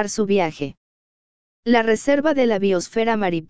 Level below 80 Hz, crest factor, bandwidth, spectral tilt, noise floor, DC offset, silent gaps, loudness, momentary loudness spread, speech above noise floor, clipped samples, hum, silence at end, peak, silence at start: -54 dBFS; 18 dB; 8 kHz; -5 dB/octave; under -90 dBFS; 1%; 0.77-1.63 s; -19 LUFS; 10 LU; over 71 dB; under 0.1%; none; 0 s; -2 dBFS; 0 s